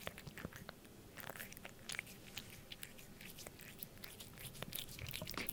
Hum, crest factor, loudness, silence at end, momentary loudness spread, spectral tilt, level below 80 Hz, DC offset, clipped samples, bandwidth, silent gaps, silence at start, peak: none; 34 dB; -50 LUFS; 0 s; 8 LU; -3 dB/octave; -66 dBFS; under 0.1%; under 0.1%; 18 kHz; none; 0 s; -16 dBFS